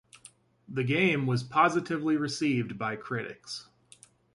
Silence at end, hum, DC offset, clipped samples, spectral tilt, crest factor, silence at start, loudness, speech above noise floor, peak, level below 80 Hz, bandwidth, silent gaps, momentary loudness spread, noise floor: 0.75 s; none; under 0.1%; under 0.1%; -5.5 dB/octave; 20 dB; 0.7 s; -28 LUFS; 30 dB; -10 dBFS; -68 dBFS; 11.5 kHz; none; 13 LU; -58 dBFS